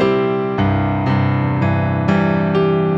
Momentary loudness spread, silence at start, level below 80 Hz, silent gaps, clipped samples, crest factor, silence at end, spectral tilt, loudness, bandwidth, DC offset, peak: 2 LU; 0 s; -40 dBFS; none; under 0.1%; 12 dB; 0 s; -9 dB/octave; -17 LUFS; 7.4 kHz; under 0.1%; -4 dBFS